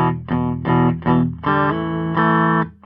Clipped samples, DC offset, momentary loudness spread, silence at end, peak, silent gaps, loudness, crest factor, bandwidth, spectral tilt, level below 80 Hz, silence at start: under 0.1%; under 0.1%; 6 LU; 0.15 s; -4 dBFS; none; -18 LUFS; 14 dB; 4.9 kHz; -11.5 dB/octave; -42 dBFS; 0 s